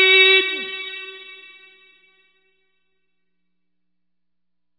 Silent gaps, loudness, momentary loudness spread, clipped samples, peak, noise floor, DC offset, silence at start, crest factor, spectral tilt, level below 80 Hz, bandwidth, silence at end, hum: none; -15 LUFS; 27 LU; under 0.1%; -2 dBFS; -84 dBFS; under 0.1%; 0 s; 22 dB; -1.5 dB/octave; -74 dBFS; 4.9 kHz; 3.45 s; 60 Hz at -85 dBFS